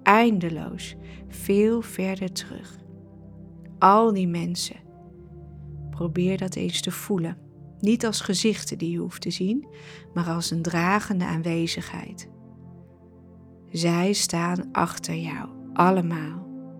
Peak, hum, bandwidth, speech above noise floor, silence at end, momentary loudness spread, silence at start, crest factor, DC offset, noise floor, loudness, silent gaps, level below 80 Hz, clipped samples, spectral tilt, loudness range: 0 dBFS; none; 17 kHz; 25 dB; 0 s; 22 LU; 0 s; 26 dB; under 0.1%; -49 dBFS; -25 LUFS; none; -54 dBFS; under 0.1%; -5 dB/octave; 4 LU